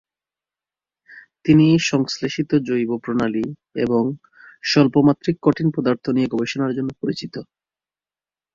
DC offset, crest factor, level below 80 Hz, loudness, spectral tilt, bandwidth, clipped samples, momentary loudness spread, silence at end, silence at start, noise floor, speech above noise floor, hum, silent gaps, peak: under 0.1%; 18 dB; -56 dBFS; -20 LUFS; -6.5 dB/octave; 7.6 kHz; under 0.1%; 12 LU; 1.1 s; 1.1 s; under -90 dBFS; over 71 dB; none; none; -2 dBFS